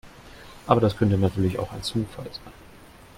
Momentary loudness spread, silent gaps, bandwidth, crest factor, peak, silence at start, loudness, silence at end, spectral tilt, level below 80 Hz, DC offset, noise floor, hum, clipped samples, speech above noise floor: 20 LU; none; 15.5 kHz; 22 dB; -2 dBFS; 0.05 s; -24 LUFS; 0.65 s; -7 dB/octave; -48 dBFS; under 0.1%; -48 dBFS; none; under 0.1%; 24 dB